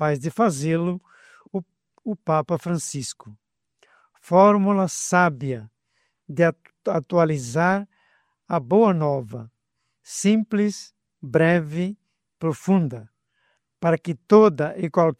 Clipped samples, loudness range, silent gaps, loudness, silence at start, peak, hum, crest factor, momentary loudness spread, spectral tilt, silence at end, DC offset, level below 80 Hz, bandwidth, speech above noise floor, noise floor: under 0.1%; 4 LU; none; -22 LUFS; 0 s; -2 dBFS; none; 20 dB; 17 LU; -6.5 dB/octave; 0.05 s; under 0.1%; -66 dBFS; 14 kHz; 56 dB; -77 dBFS